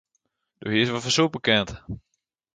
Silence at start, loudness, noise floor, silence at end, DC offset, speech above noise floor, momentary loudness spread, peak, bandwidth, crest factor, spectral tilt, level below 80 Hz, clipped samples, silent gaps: 0.6 s; -23 LUFS; -75 dBFS; 0.55 s; under 0.1%; 52 dB; 18 LU; -6 dBFS; 9.4 kHz; 22 dB; -4 dB/octave; -52 dBFS; under 0.1%; none